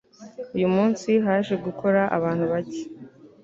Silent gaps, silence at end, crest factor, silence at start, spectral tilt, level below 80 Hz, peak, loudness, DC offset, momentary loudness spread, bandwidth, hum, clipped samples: none; 0.15 s; 18 dB; 0.2 s; -7 dB/octave; -62 dBFS; -6 dBFS; -23 LUFS; under 0.1%; 18 LU; 7.8 kHz; none; under 0.1%